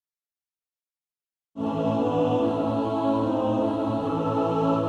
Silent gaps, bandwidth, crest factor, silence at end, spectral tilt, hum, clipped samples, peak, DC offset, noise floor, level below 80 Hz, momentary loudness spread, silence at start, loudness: none; 8.2 kHz; 14 dB; 0 s; -8.5 dB/octave; none; under 0.1%; -12 dBFS; under 0.1%; under -90 dBFS; -58 dBFS; 4 LU; 1.55 s; -25 LUFS